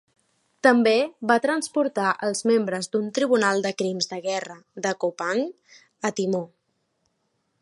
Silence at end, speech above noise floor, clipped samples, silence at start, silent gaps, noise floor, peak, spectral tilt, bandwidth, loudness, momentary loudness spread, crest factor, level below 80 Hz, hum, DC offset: 1.15 s; 50 dB; under 0.1%; 0.65 s; none; -73 dBFS; -2 dBFS; -4 dB/octave; 11.5 kHz; -24 LUFS; 10 LU; 22 dB; -78 dBFS; none; under 0.1%